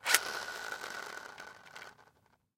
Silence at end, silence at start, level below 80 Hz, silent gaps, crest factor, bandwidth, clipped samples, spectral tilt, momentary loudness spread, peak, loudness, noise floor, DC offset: 0.55 s; 0 s; -78 dBFS; none; 36 dB; 16.5 kHz; under 0.1%; 1.5 dB/octave; 21 LU; -2 dBFS; -36 LUFS; -69 dBFS; under 0.1%